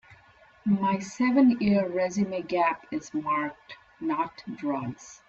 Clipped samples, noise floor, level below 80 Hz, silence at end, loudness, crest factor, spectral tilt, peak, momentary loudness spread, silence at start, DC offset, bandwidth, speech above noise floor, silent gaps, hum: under 0.1%; -57 dBFS; -64 dBFS; 0.15 s; -27 LUFS; 16 dB; -6.5 dB/octave; -10 dBFS; 14 LU; 0.1 s; under 0.1%; 8 kHz; 30 dB; none; none